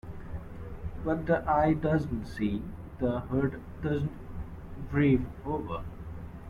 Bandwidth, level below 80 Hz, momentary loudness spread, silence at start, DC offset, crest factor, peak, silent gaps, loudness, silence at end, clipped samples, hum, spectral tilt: 12 kHz; -44 dBFS; 17 LU; 0.05 s; under 0.1%; 18 dB; -12 dBFS; none; -30 LUFS; 0 s; under 0.1%; none; -9 dB/octave